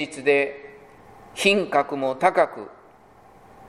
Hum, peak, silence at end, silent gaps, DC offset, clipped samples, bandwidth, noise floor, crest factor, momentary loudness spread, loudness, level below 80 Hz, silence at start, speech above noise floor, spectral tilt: none; -4 dBFS; 1 s; none; under 0.1%; under 0.1%; 14 kHz; -51 dBFS; 20 dB; 20 LU; -22 LUFS; -64 dBFS; 0 s; 30 dB; -4 dB/octave